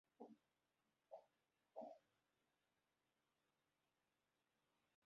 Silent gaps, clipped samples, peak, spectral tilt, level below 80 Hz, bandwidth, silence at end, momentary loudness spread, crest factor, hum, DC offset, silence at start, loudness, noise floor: none; under 0.1%; -42 dBFS; -5 dB/octave; under -90 dBFS; 5.8 kHz; 3.05 s; 6 LU; 26 dB; none; under 0.1%; 0.2 s; -63 LUFS; under -90 dBFS